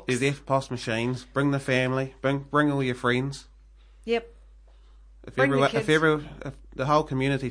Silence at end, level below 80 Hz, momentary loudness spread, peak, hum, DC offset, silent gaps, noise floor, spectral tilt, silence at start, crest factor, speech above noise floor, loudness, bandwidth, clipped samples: 0 s; -50 dBFS; 12 LU; -8 dBFS; none; under 0.1%; none; -52 dBFS; -6 dB/octave; 0 s; 18 dB; 27 dB; -25 LUFS; 10.5 kHz; under 0.1%